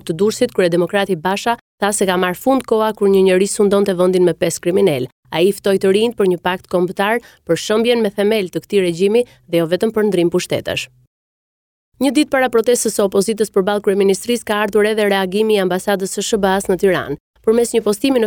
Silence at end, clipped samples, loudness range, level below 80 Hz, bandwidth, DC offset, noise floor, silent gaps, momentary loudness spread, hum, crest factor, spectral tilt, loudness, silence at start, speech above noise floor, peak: 0 s; under 0.1%; 3 LU; -52 dBFS; 18 kHz; under 0.1%; under -90 dBFS; 1.61-1.78 s, 5.12-5.23 s, 11.07-11.92 s, 17.20-17.34 s; 5 LU; none; 12 dB; -4.5 dB/octave; -16 LUFS; 0.05 s; over 75 dB; -2 dBFS